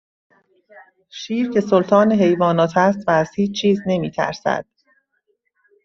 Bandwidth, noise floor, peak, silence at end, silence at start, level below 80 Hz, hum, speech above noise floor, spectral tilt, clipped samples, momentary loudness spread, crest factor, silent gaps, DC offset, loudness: 7.2 kHz; -69 dBFS; -2 dBFS; 1.2 s; 0.75 s; -58 dBFS; none; 51 dB; -6.5 dB/octave; under 0.1%; 9 LU; 18 dB; none; under 0.1%; -18 LUFS